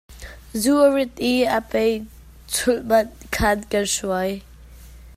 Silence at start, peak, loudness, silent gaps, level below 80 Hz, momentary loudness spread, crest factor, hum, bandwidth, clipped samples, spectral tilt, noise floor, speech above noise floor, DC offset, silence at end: 0.1 s; -4 dBFS; -21 LUFS; none; -42 dBFS; 14 LU; 18 dB; none; 16 kHz; under 0.1%; -3.5 dB/octave; -43 dBFS; 22 dB; under 0.1%; 0.05 s